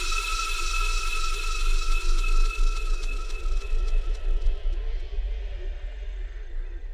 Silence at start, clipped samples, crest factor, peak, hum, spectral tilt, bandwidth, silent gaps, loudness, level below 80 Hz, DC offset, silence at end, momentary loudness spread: 0 s; under 0.1%; 12 dB; -12 dBFS; none; -2.5 dB/octave; 12.5 kHz; none; -31 LUFS; -24 dBFS; under 0.1%; 0 s; 11 LU